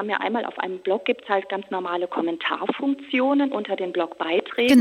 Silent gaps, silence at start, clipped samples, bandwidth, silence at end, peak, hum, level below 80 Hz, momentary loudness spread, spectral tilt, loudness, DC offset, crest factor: none; 0 s; under 0.1%; 16 kHz; 0 s; -4 dBFS; none; -70 dBFS; 6 LU; -4.5 dB/octave; -24 LUFS; under 0.1%; 18 dB